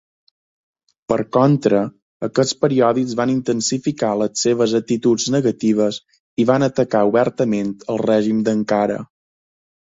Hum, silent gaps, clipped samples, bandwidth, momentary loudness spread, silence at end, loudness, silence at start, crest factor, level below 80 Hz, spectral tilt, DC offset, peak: none; 2.02-2.20 s, 6.20-6.37 s; under 0.1%; 7.8 kHz; 7 LU; 0.85 s; -18 LUFS; 1.1 s; 18 dB; -58 dBFS; -5.5 dB/octave; under 0.1%; 0 dBFS